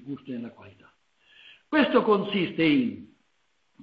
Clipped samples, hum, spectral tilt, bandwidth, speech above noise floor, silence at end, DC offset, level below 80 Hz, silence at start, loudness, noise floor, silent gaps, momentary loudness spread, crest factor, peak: under 0.1%; none; -8 dB/octave; 5.2 kHz; 48 dB; 0.75 s; under 0.1%; -68 dBFS; 0.05 s; -24 LUFS; -73 dBFS; none; 16 LU; 20 dB; -8 dBFS